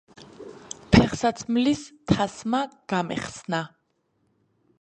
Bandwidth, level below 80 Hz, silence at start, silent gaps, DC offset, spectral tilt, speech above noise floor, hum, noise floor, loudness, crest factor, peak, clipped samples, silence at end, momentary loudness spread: 9.8 kHz; -44 dBFS; 0.2 s; none; under 0.1%; -5.5 dB/octave; 45 dB; none; -71 dBFS; -25 LUFS; 24 dB; -2 dBFS; under 0.1%; 1.15 s; 21 LU